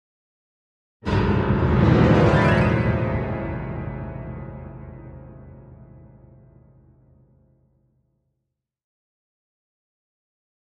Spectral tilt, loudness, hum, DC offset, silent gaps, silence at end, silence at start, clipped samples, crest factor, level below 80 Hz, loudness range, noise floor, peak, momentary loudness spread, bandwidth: -8.5 dB/octave; -20 LUFS; none; under 0.1%; none; 5 s; 1.05 s; under 0.1%; 20 dB; -36 dBFS; 21 LU; -80 dBFS; -4 dBFS; 24 LU; 8.6 kHz